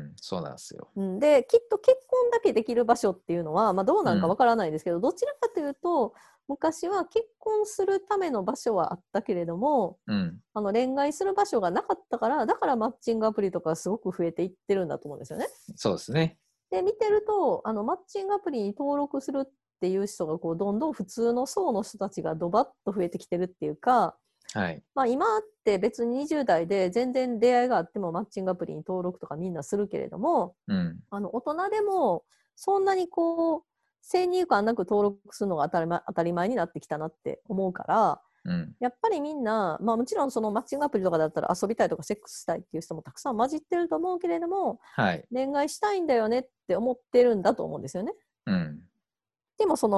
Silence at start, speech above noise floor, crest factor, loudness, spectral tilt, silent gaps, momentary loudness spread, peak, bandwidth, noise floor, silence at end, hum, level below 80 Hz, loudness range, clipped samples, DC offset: 0 s; over 63 dB; 20 dB; -28 LUFS; -6 dB/octave; none; 10 LU; -6 dBFS; 12.5 kHz; under -90 dBFS; 0 s; none; -64 dBFS; 5 LU; under 0.1%; under 0.1%